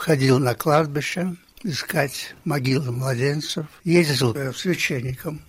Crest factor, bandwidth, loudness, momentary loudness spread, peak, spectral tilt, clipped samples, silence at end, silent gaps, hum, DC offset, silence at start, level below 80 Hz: 18 dB; 16 kHz; -22 LUFS; 10 LU; -4 dBFS; -5.5 dB/octave; under 0.1%; 0.05 s; none; none; under 0.1%; 0 s; -54 dBFS